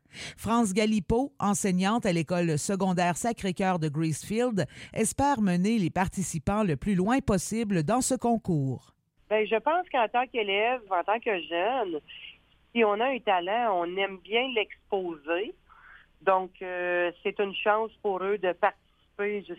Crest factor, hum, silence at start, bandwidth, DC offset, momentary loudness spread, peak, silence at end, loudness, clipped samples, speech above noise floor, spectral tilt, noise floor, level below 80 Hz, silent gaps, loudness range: 18 dB; none; 0.15 s; 16 kHz; under 0.1%; 7 LU; -10 dBFS; 0.05 s; -28 LUFS; under 0.1%; 27 dB; -5 dB/octave; -54 dBFS; -52 dBFS; none; 3 LU